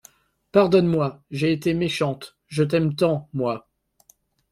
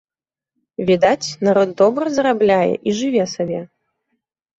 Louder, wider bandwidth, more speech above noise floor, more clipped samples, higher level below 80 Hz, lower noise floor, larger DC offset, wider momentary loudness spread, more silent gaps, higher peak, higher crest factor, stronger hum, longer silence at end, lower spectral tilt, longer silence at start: second, -22 LUFS vs -17 LUFS; first, 14.5 kHz vs 8 kHz; second, 39 dB vs over 74 dB; neither; about the same, -56 dBFS vs -58 dBFS; second, -60 dBFS vs under -90 dBFS; neither; about the same, 10 LU vs 9 LU; neither; about the same, -4 dBFS vs -2 dBFS; about the same, 20 dB vs 16 dB; neither; about the same, 0.9 s vs 0.95 s; first, -7 dB/octave vs -5.5 dB/octave; second, 0.55 s vs 0.8 s